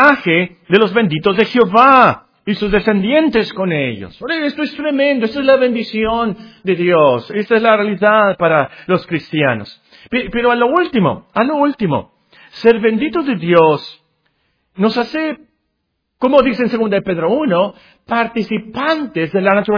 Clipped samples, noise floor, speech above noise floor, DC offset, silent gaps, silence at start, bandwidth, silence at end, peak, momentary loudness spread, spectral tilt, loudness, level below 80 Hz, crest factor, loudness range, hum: 0.2%; -70 dBFS; 56 dB; under 0.1%; none; 0 s; 5.4 kHz; 0 s; 0 dBFS; 9 LU; -8 dB/octave; -14 LUFS; -46 dBFS; 14 dB; 4 LU; none